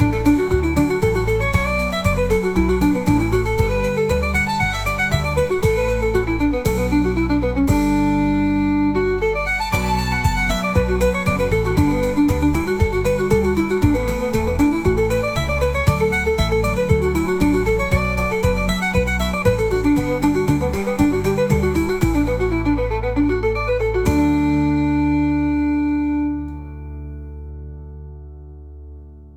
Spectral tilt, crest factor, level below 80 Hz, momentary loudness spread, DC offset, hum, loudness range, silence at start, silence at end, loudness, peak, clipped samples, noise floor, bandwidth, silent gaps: -6.5 dB/octave; 16 dB; -28 dBFS; 3 LU; 0.3%; none; 1 LU; 0 s; 0 s; -19 LUFS; -2 dBFS; under 0.1%; -38 dBFS; 17.5 kHz; none